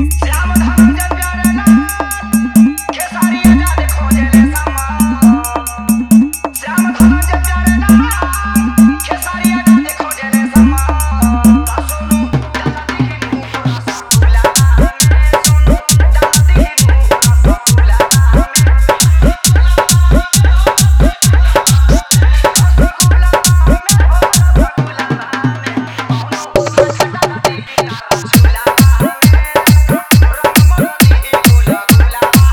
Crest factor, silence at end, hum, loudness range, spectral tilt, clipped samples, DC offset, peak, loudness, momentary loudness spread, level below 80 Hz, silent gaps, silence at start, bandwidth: 10 dB; 0 s; none; 4 LU; -5 dB/octave; 0.7%; under 0.1%; 0 dBFS; -10 LUFS; 8 LU; -14 dBFS; none; 0 s; over 20 kHz